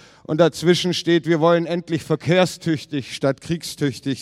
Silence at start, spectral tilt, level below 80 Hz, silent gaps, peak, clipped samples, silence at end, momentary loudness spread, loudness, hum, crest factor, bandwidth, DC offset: 0.3 s; -5.5 dB/octave; -58 dBFS; none; -2 dBFS; under 0.1%; 0 s; 8 LU; -20 LUFS; none; 18 dB; 14.5 kHz; under 0.1%